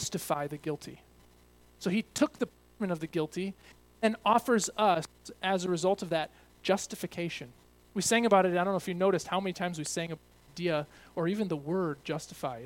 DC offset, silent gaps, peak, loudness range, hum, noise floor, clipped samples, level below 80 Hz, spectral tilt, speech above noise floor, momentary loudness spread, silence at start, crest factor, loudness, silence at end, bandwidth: under 0.1%; none; -10 dBFS; 5 LU; none; -60 dBFS; under 0.1%; -64 dBFS; -4.5 dB/octave; 29 dB; 13 LU; 0 s; 22 dB; -31 LUFS; 0 s; 17.5 kHz